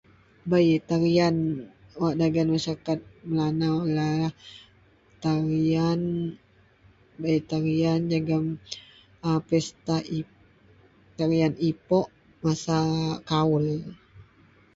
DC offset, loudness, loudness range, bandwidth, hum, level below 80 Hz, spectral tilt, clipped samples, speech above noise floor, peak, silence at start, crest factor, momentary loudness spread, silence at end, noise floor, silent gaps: under 0.1%; -26 LUFS; 3 LU; 7.8 kHz; none; -56 dBFS; -7 dB/octave; under 0.1%; 34 dB; -10 dBFS; 0.45 s; 16 dB; 11 LU; 0.55 s; -58 dBFS; none